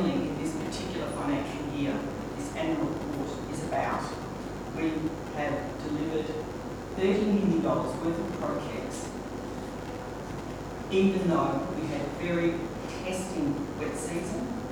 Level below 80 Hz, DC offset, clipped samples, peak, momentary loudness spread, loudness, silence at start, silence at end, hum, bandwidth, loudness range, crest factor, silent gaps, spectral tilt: -48 dBFS; under 0.1%; under 0.1%; -12 dBFS; 11 LU; -31 LUFS; 0 s; 0 s; none; 20 kHz; 3 LU; 18 dB; none; -6 dB/octave